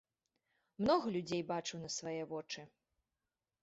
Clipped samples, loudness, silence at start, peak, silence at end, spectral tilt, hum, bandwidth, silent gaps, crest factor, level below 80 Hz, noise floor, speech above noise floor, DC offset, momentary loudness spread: under 0.1%; -39 LUFS; 0.8 s; -20 dBFS; 0.95 s; -4.5 dB/octave; none; 8 kHz; none; 22 dB; -72 dBFS; under -90 dBFS; over 52 dB; under 0.1%; 11 LU